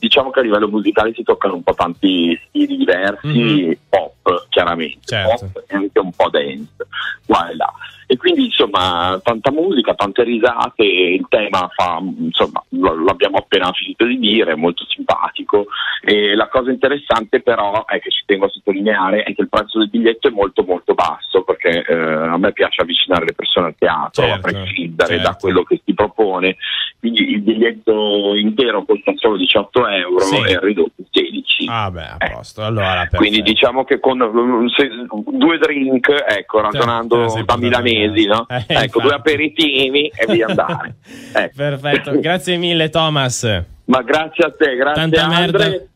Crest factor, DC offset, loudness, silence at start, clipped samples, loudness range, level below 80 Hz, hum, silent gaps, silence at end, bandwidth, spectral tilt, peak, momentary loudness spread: 14 dB; under 0.1%; -15 LUFS; 0 s; under 0.1%; 2 LU; -44 dBFS; none; none; 0.1 s; 14.5 kHz; -5 dB/octave; -2 dBFS; 6 LU